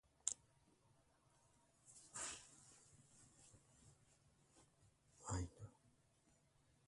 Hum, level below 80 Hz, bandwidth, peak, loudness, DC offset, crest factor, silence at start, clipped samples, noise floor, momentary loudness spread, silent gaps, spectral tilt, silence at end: none; -68 dBFS; 11.5 kHz; -20 dBFS; -50 LUFS; under 0.1%; 36 dB; 0.25 s; under 0.1%; -78 dBFS; 22 LU; none; -3 dB/octave; 1 s